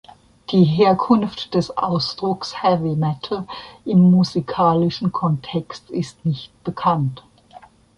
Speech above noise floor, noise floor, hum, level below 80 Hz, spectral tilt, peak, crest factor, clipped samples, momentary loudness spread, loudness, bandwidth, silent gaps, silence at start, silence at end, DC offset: 27 dB; -46 dBFS; none; -54 dBFS; -7.5 dB/octave; -2 dBFS; 16 dB; under 0.1%; 13 LU; -19 LUFS; 8.8 kHz; none; 0.5 s; 0.4 s; under 0.1%